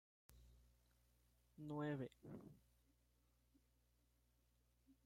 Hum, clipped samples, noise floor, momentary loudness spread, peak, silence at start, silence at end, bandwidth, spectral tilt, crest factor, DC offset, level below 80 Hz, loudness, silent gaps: 60 Hz at -75 dBFS; under 0.1%; -81 dBFS; 13 LU; -38 dBFS; 0.3 s; 0.1 s; 16 kHz; -8 dB/octave; 20 dB; under 0.1%; -78 dBFS; -52 LUFS; none